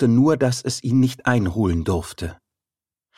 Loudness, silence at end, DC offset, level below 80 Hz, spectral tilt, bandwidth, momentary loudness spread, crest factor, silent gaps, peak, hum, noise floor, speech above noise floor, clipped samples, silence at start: -20 LUFS; 0.85 s; under 0.1%; -40 dBFS; -6.5 dB/octave; 15 kHz; 14 LU; 18 dB; none; -2 dBFS; none; under -90 dBFS; over 71 dB; under 0.1%; 0 s